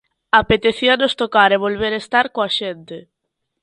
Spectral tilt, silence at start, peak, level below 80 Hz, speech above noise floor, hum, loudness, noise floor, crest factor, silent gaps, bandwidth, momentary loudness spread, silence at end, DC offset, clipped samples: -4.5 dB/octave; 0.35 s; 0 dBFS; -46 dBFS; 59 dB; none; -16 LUFS; -76 dBFS; 18 dB; none; 11 kHz; 15 LU; 0.65 s; under 0.1%; under 0.1%